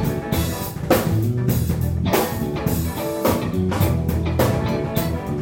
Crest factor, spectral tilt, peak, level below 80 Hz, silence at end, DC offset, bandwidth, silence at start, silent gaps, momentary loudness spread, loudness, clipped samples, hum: 18 dB; -6 dB/octave; -2 dBFS; -32 dBFS; 0 s; under 0.1%; 17 kHz; 0 s; none; 4 LU; -21 LUFS; under 0.1%; none